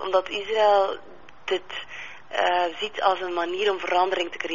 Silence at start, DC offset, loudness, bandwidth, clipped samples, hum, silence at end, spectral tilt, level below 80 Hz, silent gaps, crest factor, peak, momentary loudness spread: 0 s; 0.6%; -24 LUFS; 7.2 kHz; under 0.1%; none; 0 s; 0.5 dB/octave; -64 dBFS; none; 18 dB; -6 dBFS; 15 LU